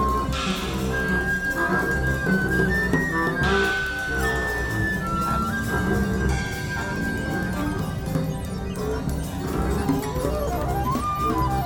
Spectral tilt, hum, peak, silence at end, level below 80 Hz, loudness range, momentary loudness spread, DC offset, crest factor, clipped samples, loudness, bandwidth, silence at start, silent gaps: -5.5 dB/octave; none; -8 dBFS; 0 s; -32 dBFS; 4 LU; 6 LU; under 0.1%; 16 dB; under 0.1%; -24 LUFS; 18.5 kHz; 0 s; none